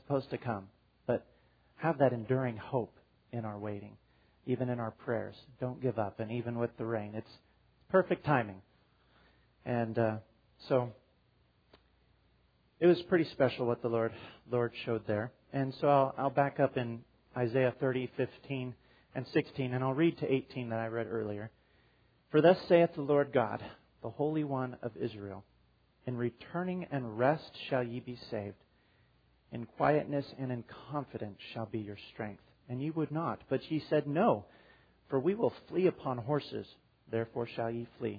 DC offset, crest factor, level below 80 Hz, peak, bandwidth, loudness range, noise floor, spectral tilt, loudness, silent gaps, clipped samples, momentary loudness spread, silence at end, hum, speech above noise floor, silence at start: under 0.1%; 22 dB; -70 dBFS; -12 dBFS; 5 kHz; 7 LU; -70 dBFS; -6 dB/octave; -34 LUFS; none; under 0.1%; 15 LU; 0 s; none; 37 dB; 0.1 s